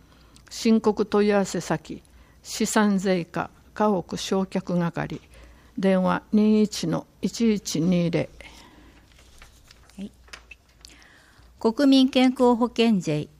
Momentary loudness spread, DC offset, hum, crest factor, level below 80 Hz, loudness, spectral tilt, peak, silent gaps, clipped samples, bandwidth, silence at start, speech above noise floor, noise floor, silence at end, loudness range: 19 LU; under 0.1%; none; 16 dB; -54 dBFS; -23 LUFS; -5.5 dB/octave; -8 dBFS; none; under 0.1%; 15.5 kHz; 0.5 s; 31 dB; -53 dBFS; 0.15 s; 6 LU